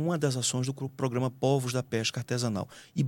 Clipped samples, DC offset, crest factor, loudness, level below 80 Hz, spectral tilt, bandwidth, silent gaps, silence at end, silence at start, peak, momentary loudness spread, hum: under 0.1%; under 0.1%; 16 dB; -30 LUFS; -70 dBFS; -5 dB/octave; 17 kHz; none; 0 s; 0 s; -12 dBFS; 6 LU; none